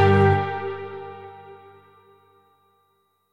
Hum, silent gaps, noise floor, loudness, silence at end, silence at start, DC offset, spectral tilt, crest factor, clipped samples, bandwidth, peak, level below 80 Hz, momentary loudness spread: none; none; -68 dBFS; -22 LUFS; 1.75 s; 0 s; under 0.1%; -8.5 dB/octave; 18 dB; under 0.1%; 5.8 kHz; -6 dBFS; -62 dBFS; 26 LU